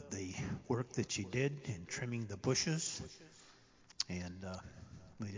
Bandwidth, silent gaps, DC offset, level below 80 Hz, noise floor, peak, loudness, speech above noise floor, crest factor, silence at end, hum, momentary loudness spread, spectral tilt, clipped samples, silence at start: 7.8 kHz; none; under 0.1%; -62 dBFS; -64 dBFS; -18 dBFS; -40 LUFS; 24 dB; 24 dB; 0 s; none; 20 LU; -4 dB/octave; under 0.1%; 0 s